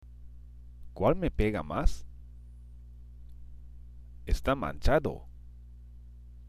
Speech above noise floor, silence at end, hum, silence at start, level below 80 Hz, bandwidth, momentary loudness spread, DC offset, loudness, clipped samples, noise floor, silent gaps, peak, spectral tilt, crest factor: 21 dB; 0 s; 60 Hz at -45 dBFS; 0.05 s; -36 dBFS; 14 kHz; 24 LU; under 0.1%; -31 LUFS; under 0.1%; -49 dBFS; none; -10 dBFS; -7 dB/octave; 22 dB